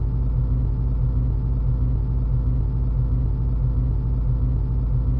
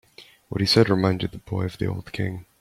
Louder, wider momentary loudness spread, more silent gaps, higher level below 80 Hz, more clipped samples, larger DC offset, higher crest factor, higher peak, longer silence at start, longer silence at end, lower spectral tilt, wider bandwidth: about the same, -23 LUFS vs -24 LUFS; second, 1 LU vs 12 LU; neither; first, -22 dBFS vs -50 dBFS; neither; neither; second, 8 dB vs 20 dB; second, -12 dBFS vs -4 dBFS; second, 0 s vs 0.2 s; second, 0 s vs 0.2 s; first, -12.5 dB/octave vs -6 dB/octave; second, 1.6 kHz vs 14.5 kHz